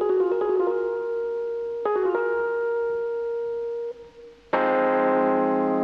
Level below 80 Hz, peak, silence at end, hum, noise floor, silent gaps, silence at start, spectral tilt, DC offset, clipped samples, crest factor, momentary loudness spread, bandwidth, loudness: -62 dBFS; -8 dBFS; 0 s; none; -47 dBFS; none; 0 s; -8 dB/octave; under 0.1%; under 0.1%; 16 dB; 8 LU; 5.8 kHz; -24 LUFS